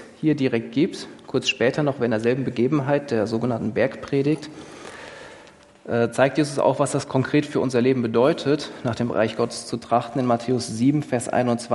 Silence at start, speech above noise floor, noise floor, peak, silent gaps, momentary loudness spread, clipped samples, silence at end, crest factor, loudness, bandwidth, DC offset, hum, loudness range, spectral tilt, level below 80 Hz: 0 s; 26 dB; -48 dBFS; -2 dBFS; none; 8 LU; under 0.1%; 0 s; 20 dB; -22 LUFS; 11.5 kHz; under 0.1%; none; 3 LU; -6 dB/octave; -62 dBFS